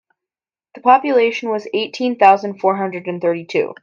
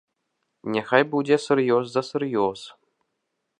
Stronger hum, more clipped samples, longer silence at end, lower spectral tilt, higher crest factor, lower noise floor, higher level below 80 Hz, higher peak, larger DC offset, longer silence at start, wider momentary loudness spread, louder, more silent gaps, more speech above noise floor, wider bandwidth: neither; neither; second, 0.1 s vs 0.9 s; about the same, -5.5 dB/octave vs -5.5 dB/octave; second, 16 dB vs 24 dB; first, under -90 dBFS vs -78 dBFS; about the same, -68 dBFS vs -70 dBFS; about the same, 0 dBFS vs -2 dBFS; neither; about the same, 0.75 s vs 0.65 s; second, 9 LU vs 14 LU; first, -16 LUFS vs -23 LUFS; neither; first, over 74 dB vs 56 dB; second, 7.2 kHz vs 10.5 kHz